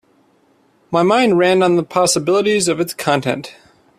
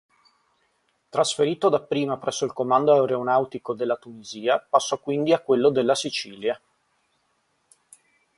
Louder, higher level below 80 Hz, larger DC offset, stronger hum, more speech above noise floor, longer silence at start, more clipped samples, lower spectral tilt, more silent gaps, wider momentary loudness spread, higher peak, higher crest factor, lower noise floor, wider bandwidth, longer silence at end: first, -15 LUFS vs -23 LUFS; first, -58 dBFS vs -70 dBFS; neither; neither; second, 41 dB vs 47 dB; second, 0.9 s vs 1.15 s; neither; about the same, -4 dB/octave vs -4.5 dB/octave; neither; about the same, 8 LU vs 10 LU; first, 0 dBFS vs -4 dBFS; about the same, 16 dB vs 20 dB; second, -56 dBFS vs -70 dBFS; first, 15 kHz vs 11.5 kHz; second, 0.45 s vs 1.8 s